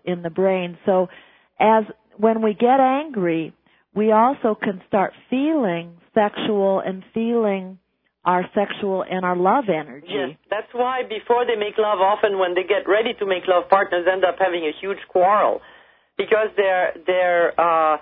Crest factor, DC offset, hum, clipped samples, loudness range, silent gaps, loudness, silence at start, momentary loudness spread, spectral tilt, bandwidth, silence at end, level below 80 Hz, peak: 18 dB; under 0.1%; none; under 0.1%; 3 LU; none; -20 LUFS; 0.05 s; 10 LU; -10 dB/octave; 4.3 kHz; 0 s; -66 dBFS; -2 dBFS